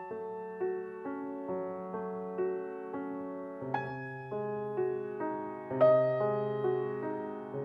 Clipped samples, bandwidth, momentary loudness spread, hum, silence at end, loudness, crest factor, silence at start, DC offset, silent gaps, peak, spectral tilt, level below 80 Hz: under 0.1%; 5.4 kHz; 12 LU; none; 0 s; -34 LUFS; 20 dB; 0 s; under 0.1%; none; -14 dBFS; -9.5 dB/octave; -78 dBFS